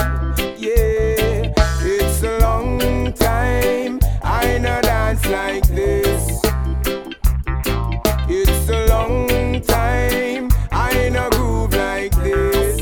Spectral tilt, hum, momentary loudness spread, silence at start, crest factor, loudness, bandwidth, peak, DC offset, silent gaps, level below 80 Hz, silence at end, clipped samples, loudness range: -5 dB/octave; none; 4 LU; 0 s; 16 dB; -18 LUFS; over 20 kHz; 0 dBFS; under 0.1%; none; -20 dBFS; 0 s; under 0.1%; 1 LU